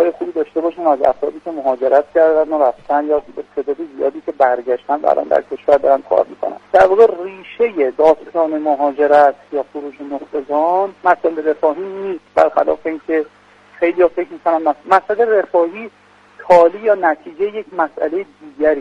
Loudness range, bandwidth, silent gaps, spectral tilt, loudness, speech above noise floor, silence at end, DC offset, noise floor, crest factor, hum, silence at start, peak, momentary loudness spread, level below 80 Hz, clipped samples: 3 LU; 8 kHz; none; -6 dB/octave; -16 LUFS; 28 dB; 0 s; under 0.1%; -43 dBFS; 16 dB; none; 0 s; 0 dBFS; 12 LU; -56 dBFS; under 0.1%